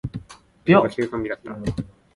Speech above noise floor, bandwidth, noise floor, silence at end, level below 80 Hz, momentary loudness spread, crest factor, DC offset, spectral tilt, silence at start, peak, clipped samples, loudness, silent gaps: 23 dB; 11.5 kHz; -44 dBFS; 0.3 s; -46 dBFS; 17 LU; 20 dB; under 0.1%; -7.5 dB/octave; 0.05 s; -2 dBFS; under 0.1%; -22 LUFS; none